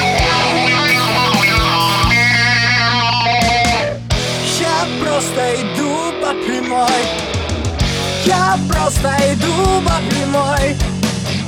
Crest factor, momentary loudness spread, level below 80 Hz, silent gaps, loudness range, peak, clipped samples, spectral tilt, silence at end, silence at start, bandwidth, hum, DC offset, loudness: 14 dB; 7 LU; -28 dBFS; none; 5 LU; 0 dBFS; under 0.1%; -4 dB/octave; 0 s; 0 s; 19.5 kHz; none; under 0.1%; -14 LUFS